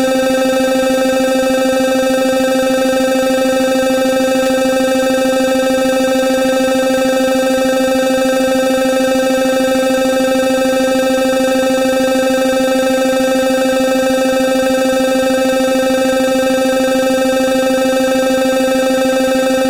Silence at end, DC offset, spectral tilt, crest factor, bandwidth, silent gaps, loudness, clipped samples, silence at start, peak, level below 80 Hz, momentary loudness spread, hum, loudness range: 0 s; 0.5%; -3.5 dB/octave; 8 dB; 16.5 kHz; none; -13 LUFS; under 0.1%; 0 s; -4 dBFS; -46 dBFS; 0 LU; none; 0 LU